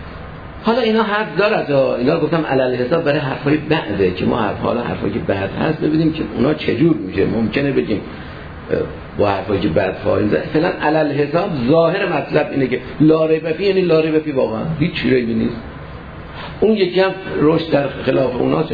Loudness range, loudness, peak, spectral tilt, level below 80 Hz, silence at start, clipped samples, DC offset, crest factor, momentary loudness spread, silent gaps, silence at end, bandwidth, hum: 3 LU; -17 LUFS; 0 dBFS; -9 dB/octave; -40 dBFS; 0 s; under 0.1%; 0.2%; 16 dB; 8 LU; none; 0 s; 5 kHz; none